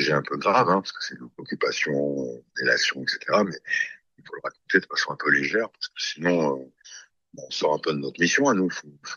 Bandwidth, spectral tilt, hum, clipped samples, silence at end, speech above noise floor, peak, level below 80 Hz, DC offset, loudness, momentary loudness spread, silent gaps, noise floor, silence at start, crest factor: 11.5 kHz; -3.5 dB/octave; none; under 0.1%; 0 s; 23 dB; -4 dBFS; -70 dBFS; under 0.1%; -24 LUFS; 15 LU; none; -48 dBFS; 0 s; 22 dB